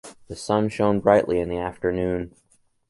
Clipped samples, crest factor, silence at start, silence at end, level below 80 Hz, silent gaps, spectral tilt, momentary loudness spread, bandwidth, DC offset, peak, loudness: under 0.1%; 20 dB; 0.05 s; 0.6 s; -46 dBFS; none; -6.5 dB/octave; 16 LU; 11.5 kHz; under 0.1%; -2 dBFS; -23 LUFS